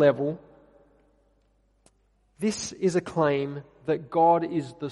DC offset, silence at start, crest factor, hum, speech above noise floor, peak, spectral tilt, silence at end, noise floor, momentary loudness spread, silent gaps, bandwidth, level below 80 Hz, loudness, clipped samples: under 0.1%; 0 s; 20 dB; 50 Hz at -60 dBFS; 41 dB; -8 dBFS; -5.5 dB/octave; 0 s; -66 dBFS; 11 LU; none; 11.5 kHz; -64 dBFS; -26 LUFS; under 0.1%